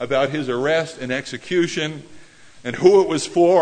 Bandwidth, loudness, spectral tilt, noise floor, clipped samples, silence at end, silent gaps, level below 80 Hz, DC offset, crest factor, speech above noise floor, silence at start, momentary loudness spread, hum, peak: 9.6 kHz; -19 LUFS; -5 dB/octave; -43 dBFS; under 0.1%; 0 s; none; -58 dBFS; under 0.1%; 18 dB; 24 dB; 0 s; 13 LU; none; 0 dBFS